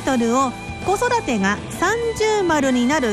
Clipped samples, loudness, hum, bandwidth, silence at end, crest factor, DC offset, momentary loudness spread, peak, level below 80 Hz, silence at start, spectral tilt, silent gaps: under 0.1%; -19 LUFS; none; 13 kHz; 0 s; 12 dB; under 0.1%; 4 LU; -8 dBFS; -42 dBFS; 0 s; -4.5 dB/octave; none